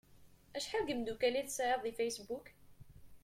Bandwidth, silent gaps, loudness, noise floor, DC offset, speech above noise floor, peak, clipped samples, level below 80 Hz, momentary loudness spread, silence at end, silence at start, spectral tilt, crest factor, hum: 16.5 kHz; none; -38 LUFS; -62 dBFS; under 0.1%; 24 dB; -22 dBFS; under 0.1%; -66 dBFS; 11 LU; 0.05 s; 0.1 s; -2.5 dB/octave; 18 dB; none